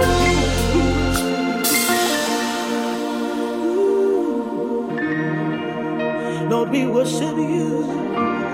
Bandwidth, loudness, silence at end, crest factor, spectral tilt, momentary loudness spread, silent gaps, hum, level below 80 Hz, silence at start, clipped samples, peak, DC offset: 16.5 kHz; -20 LUFS; 0 s; 16 dB; -4.5 dB/octave; 7 LU; none; none; -34 dBFS; 0 s; under 0.1%; -4 dBFS; under 0.1%